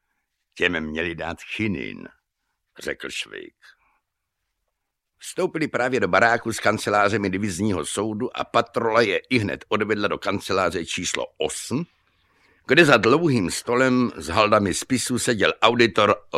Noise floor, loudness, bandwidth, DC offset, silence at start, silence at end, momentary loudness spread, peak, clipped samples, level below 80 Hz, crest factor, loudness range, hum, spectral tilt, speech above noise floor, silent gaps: -79 dBFS; -22 LUFS; 15 kHz; under 0.1%; 0.55 s; 0 s; 12 LU; -2 dBFS; under 0.1%; -54 dBFS; 22 dB; 13 LU; none; -4 dB/octave; 57 dB; none